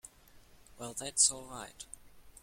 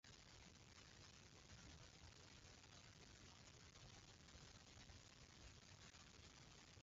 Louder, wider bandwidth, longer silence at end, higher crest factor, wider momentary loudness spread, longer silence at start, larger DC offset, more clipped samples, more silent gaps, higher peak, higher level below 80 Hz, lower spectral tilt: first, -29 LUFS vs -64 LUFS; first, 16.5 kHz vs 7.6 kHz; about the same, 0.05 s vs 0 s; first, 28 dB vs 16 dB; first, 22 LU vs 1 LU; about the same, 0.05 s vs 0.05 s; neither; neither; neither; first, -10 dBFS vs -50 dBFS; first, -62 dBFS vs -72 dBFS; second, 0 dB/octave vs -3 dB/octave